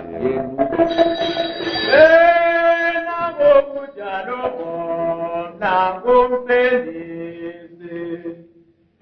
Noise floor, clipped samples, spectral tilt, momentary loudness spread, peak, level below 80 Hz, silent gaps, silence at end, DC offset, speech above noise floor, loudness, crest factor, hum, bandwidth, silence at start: -54 dBFS; under 0.1%; -6 dB/octave; 19 LU; 0 dBFS; -50 dBFS; none; 0.6 s; under 0.1%; 37 dB; -17 LUFS; 18 dB; none; 6.4 kHz; 0 s